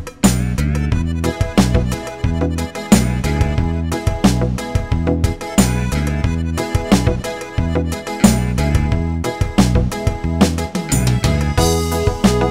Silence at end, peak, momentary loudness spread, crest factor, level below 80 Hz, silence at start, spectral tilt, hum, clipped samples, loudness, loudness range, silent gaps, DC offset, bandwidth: 0 s; 0 dBFS; 6 LU; 16 dB; -24 dBFS; 0 s; -5.5 dB/octave; none; under 0.1%; -17 LUFS; 1 LU; none; 0.4%; 16 kHz